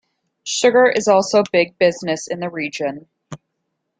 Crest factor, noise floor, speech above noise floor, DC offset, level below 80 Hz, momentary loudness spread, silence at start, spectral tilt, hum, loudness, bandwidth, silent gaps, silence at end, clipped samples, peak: 16 dB; -75 dBFS; 58 dB; under 0.1%; -64 dBFS; 12 LU; 0.45 s; -3.5 dB/octave; none; -17 LUFS; 9.4 kHz; none; 0.65 s; under 0.1%; -2 dBFS